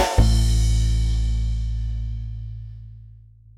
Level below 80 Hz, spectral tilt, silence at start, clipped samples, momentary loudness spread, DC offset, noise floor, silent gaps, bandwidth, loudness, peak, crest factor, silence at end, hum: -22 dBFS; -5.5 dB/octave; 0 s; under 0.1%; 19 LU; under 0.1%; -46 dBFS; none; 13 kHz; -23 LUFS; -4 dBFS; 18 dB; 0.5 s; none